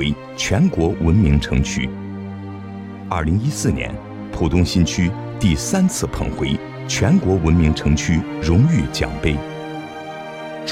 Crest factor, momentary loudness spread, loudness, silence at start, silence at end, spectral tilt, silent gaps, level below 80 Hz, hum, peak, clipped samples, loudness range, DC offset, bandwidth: 14 dB; 15 LU; -19 LUFS; 0 s; 0 s; -5.5 dB/octave; none; -28 dBFS; none; -4 dBFS; under 0.1%; 4 LU; under 0.1%; 15.5 kHz